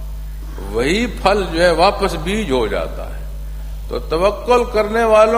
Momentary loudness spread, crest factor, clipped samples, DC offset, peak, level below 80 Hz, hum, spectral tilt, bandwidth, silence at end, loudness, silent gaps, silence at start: 17 LU; 16 dB; under 0.1%; under 0.1%; 0 dBFS; -26 dBFS; none; -5 dB/octave; 15.5 kHz; 0 s; -17 LUFS; none; 0 s